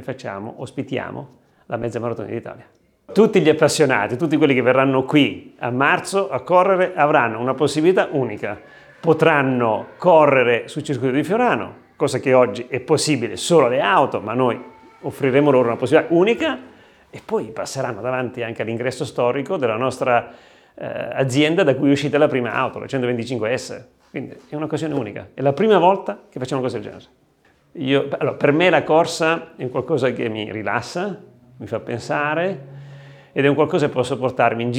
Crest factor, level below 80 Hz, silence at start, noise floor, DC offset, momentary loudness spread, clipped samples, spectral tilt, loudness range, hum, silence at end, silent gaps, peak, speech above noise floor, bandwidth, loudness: 18 dB; -64 dBFS; 0 s; -58 dBFS; under 0.1%; 15 LU; under 0.1%; -5.5 dB/octave; 6 LU; none; 0 s; none; -2 dBFS; 39 dB; 14.5 kHz; -19 LUFS